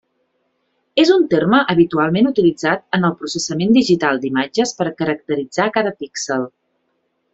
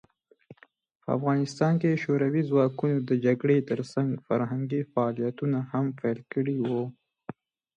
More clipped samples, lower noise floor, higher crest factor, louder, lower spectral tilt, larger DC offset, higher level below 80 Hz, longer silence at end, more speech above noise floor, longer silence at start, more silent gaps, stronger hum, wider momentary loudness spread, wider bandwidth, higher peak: neither; first, -68 dBFS vs -55 dBFS; about the same, 16 dB vs 18 dB; first, -17 LUFS vs -27 LUFS; second, -5 dB/octave vs -8.5 dB/octave; neither; first, -56 dBFS vs -72 dBFS; first, 0.85 s vs 0.45 s; first, 52 dB vs 29 dB; first, 0.95 s vs 0.5 s; second, none vs 0.95-1.00 s; neither; about the same, 9 LU vs 8 LU; second, 8 kHz vs 9.6 kHz; first, -2 dBFS vs -10 dBFS